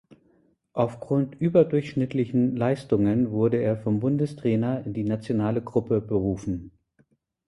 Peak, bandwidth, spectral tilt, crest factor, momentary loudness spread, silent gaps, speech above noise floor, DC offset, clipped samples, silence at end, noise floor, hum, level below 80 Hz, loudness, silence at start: -6 dBFS; 11.5 kHz; -9.5 dB/octave; 18 dB; 6 LU; none; 42 dB; under 0.1%; under 0.1%; 0.8 s; -66 dBFS; none; -52 dBFS; -25 LUFS; 0.75 s